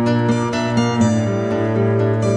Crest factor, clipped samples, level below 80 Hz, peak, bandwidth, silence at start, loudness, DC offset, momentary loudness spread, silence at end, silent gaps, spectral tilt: 12 dB; under 0.1%; -50 dBFS; -4 dBFS; 10 kHz; 0 s; -18 LUFS; under 0.1%; 3 LU; 0 s; none; -7 dB/octave